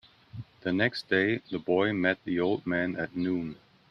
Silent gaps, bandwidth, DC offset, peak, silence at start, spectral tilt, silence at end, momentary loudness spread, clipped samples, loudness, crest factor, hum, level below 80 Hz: none; 9.6 kHz; under 0.1%; -10 dBFS; 0.35 s; -7.5 dB/octave; 0.35 s; 13 LU; under 0.1%; -29 LUFS; 20 dB; none; -64 dBFS